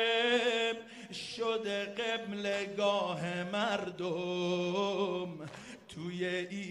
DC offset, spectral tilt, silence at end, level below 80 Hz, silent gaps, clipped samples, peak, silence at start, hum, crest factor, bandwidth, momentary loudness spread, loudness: under 0.1%; -4.5 dB/octave; 0 s; -76 dBFS; none; under 0.1%; -18 dBFS; 0 s; none; 16 dB; 12 kHz; 13 LU; -34 LUFS